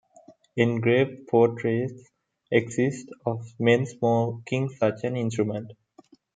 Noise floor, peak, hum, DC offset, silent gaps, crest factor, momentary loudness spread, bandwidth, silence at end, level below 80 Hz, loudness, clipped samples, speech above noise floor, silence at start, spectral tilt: -57 dBFS; -4 dBFS; none; under 0.1%; none; 20 dB; 10 LU; 9.2 kHz; 0.65 s; -70 dBFS; -25 LUFS; under 0.1%; 32 dB; 0.3 s; -7 dB/octave